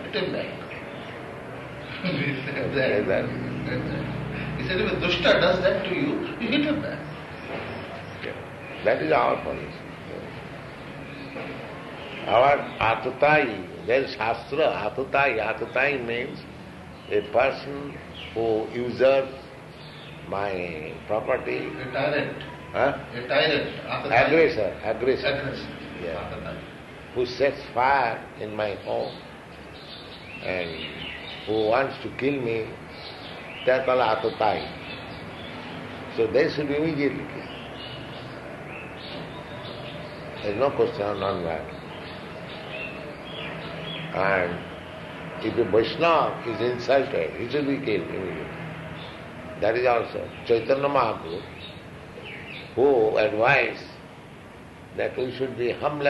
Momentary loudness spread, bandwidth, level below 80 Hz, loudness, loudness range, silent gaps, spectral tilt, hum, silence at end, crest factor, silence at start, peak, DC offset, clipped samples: 17 LU; 12 kHz; -52 dBFS; -26 LUFS; 6 LU; none; -6.5 dB/octave; none; 0 s; 18 dB; 0 s; -8 dBFS; under 0.1%; under 0.1%